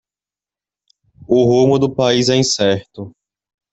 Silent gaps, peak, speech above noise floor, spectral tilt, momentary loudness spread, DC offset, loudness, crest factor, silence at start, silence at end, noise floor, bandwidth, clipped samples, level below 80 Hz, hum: none; -2 dBFS; over 76 dB; -5 dB/octave; 21 LU; under 0.1%; -14 LUFS; 16 dB; 1.3 s; 0.65 s; under -90 dBFS; 8.2 kHz; under 0.1%; -52 dBFS; none